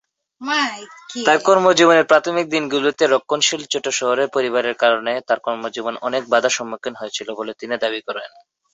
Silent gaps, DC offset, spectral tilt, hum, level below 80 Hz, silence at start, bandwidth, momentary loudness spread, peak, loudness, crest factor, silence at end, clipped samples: none; under 0.1%; -2.5 dB/octave; none; -68 dBFS; 0.4 s; 8.2 kHz; 14 LU; -2 dBFS; -18 LUFS; 18 dB; 0.45 s; under 0.1%